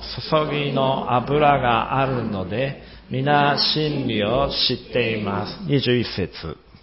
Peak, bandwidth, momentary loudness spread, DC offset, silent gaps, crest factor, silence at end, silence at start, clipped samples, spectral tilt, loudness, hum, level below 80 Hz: -2 dBFS; 5.8 kHz; 10 LU; under 0.1%; none; 20 dB; 0.3 s; 0 s; under 0.1%; -9 dB/octave; -21 LUFS; none; -44 dBFS